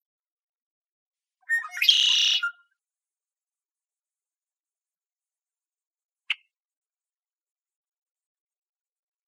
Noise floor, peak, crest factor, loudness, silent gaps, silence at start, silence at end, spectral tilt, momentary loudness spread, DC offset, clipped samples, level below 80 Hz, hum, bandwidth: under -90 dBFS; -6 dBFS; 26 dB; -21 LUFS; 5.12-5.16 s, 5.87-5.91 s, 6.05-6.09 s; 1.5 s; 2.9 s; 11.5 dB/octave; 14 LU; under 0.1%; under 0.1%; under -90 dBFS; none; 15.5 kHz